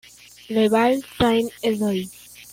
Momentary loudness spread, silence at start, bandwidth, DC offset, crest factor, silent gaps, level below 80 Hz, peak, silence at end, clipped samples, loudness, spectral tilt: 11 LU; 0.5 s; 16.5 kHz; under 0.1%; 16 dB; none; -52 dBFS; -6 dBFS; 0.1 s; under 0.1%; -21 LUFS; -5 dB/octave